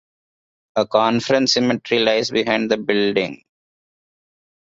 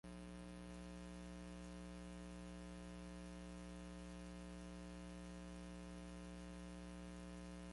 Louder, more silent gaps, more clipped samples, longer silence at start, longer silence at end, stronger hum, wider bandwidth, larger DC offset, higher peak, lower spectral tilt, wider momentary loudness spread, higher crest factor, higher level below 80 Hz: first, -18 LUFS vs -55 LUFS; neither; neither; first, 0.75 s vs 0.05 s; first, 1.35 s vs 0 s; second, none vs 60 Hz at -55 dBFS; second, 7.8 kHz vs 11.5 kHz; neither; first, -2 dBFS vs -42 dBFS; second, -4 dB/octave vs -5.5 dB/octave; first, 6 LU vs 0 LU; first, 18 dB vs 10 dB; about the same, -60 dBFS vs -60 dBFS